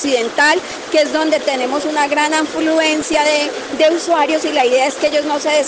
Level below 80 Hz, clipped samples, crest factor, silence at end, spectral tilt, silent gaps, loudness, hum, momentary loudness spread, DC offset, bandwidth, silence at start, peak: -56 dBFS; under 0.1%; 12 dB; 0 s; -1.5 dB/octave; none; -15 LUFS; none; 4 LU; under 0.1%; 9.8 kHz; 0 s; -2 dBFS